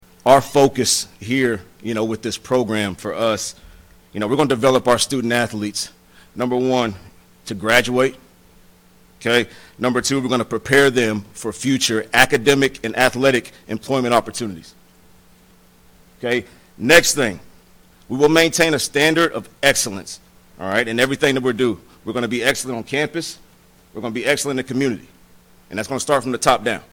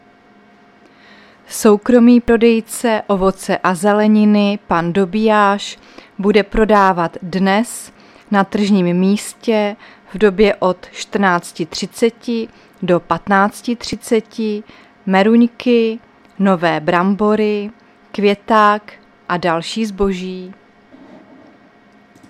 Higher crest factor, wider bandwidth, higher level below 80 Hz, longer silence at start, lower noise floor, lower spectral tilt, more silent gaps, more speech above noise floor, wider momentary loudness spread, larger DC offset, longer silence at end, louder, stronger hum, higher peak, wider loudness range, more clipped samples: about the same, 20 dB vs 16 dB; first, over 20 kHz vs 14.5 kHz; second, -50 dBFS vs -42 dBFS; second, 0.25 s vs 1.5 s; about the same, -51 dBFS vs -48 dBFS; second, -3.5 dB/octave vs -5.5 dB/octave; neither; about the same, 32 dB vs 33 dB; about the same, 15 LU vs 14 LU; neither; second, 0.1 s vs 1.8 s; second, -18 LUFS vs -15 LUFS; neither; about the same, 0 dBFS vs 0 dBFS; about the same, 6 LU vs 4 LU; neither